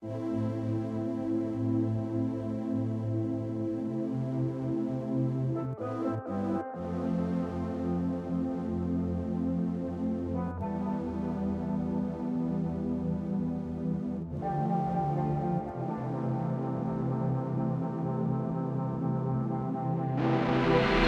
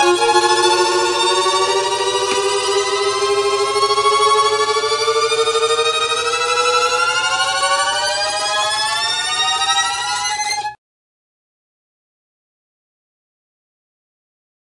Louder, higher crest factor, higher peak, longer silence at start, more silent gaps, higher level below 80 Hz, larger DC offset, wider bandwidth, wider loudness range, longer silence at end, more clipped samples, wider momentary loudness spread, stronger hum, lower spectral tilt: second, -32 LUFS vs -15 LUFS; about the same, 18 dB vs 18 dB; second, -12 dBFS vs 0 dBFS; about the same, 0 s vs 0 s; neither; about the same, -52 dBFS vs -56 dBFS; neither; second, 7.6 kHz vs 11.5 kHz; second, 1 LU vs 6 LU; second, 0 s vs 4 s; neither; about the same, 4 LU vs 4 LU; neither; first, -9 dB/octave vs -0.5 dB/octave